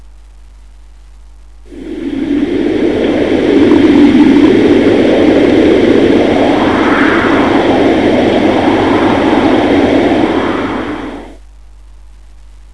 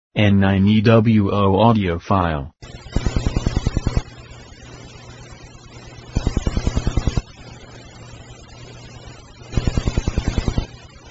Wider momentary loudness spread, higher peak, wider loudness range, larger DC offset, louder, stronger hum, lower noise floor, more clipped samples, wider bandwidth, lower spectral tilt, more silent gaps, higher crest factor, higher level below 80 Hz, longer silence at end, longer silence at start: second, 11 LU vs 25 LU; about the same, 0 dBFS vs 0 dBFS; second, 6 LU vs 11 LU; first, 1% vs under 0.1%; first, -9 LUFS vs -19 LUFS; neither; second, -36 dBFS vs -40 dBFS; first, 0.8% vs under 0.1%; first, 10.5 kHz vs 8 kHz; about the same, -6.5 dB/octave vs -7 dB/octave; neither; second, 10 dB vs 20 dB; second, -34 dBFS vs -28 dBFS; first, 1.4 s vs 0 s; first, 1.7 s vs 0.15 s